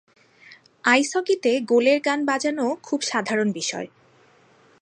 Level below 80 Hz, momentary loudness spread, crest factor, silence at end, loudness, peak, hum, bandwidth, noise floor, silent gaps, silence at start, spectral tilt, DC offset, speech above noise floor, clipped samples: -78 dBFS; 8 LU; 20 dB; 0.95 s; -22 LUFS; -4 dBFS; none; 11 kHz; -56 dBFS; none; 0.5 s; -3 dB/octave; under 0.1%; 35 dB; under 0.1%